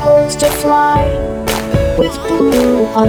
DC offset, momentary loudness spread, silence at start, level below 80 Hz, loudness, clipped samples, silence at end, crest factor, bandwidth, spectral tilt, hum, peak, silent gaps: under 0.1%; 6 LU; 0 s; -26 dBFS; -13 LUFS; under 0.1%; 0 s; 12 dB; over 20 kHz; -5.5 dB/octave; none; 0 dBFS; none